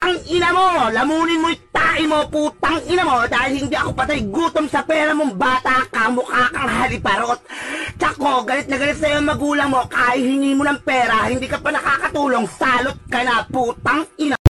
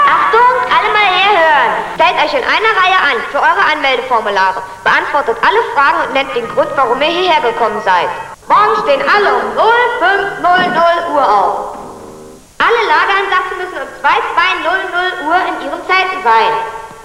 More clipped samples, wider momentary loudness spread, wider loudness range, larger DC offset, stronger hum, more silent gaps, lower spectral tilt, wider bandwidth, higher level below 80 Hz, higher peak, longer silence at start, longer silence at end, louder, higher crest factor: neither; about the same, 5 LU vs 7 LU; about the same, 2 LU vs 3 LU; neither; neither; first, 14.39-14.45 s vs none; first, -4.5 dB/octave vs -3 dB/octave; second, 12.5 kHz vs 14 kHz; about the same, -42 dBFS vs -46 dBFS; about the same, 0 dBFS vs 0 dBFS; about the same, 0 s vs 0 s; about the same, 0 s vs 0 s; second, -18 LUFS vs -11 LUFS; first, 18 dB vs 12 dB